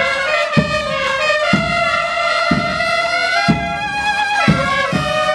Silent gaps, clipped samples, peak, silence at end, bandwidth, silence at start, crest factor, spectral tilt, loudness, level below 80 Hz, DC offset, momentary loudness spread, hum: none; under 0.1%; 0 dBFS; 0 s; 13 kHz; 0 s; 16 dB; -4.5 dB/octave; -15 LUFS; -38 dBFS; under 0.1%; 3 LU; none